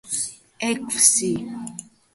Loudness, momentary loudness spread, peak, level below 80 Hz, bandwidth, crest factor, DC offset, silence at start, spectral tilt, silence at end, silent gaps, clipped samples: -20 LUFS; 19 LU; 0 dBFS; -62 dBFS; 12 kHz; 24 dB; under 0.1%; 0.05 s; -2 dB/octave; 0.35 s; none; under 0.1%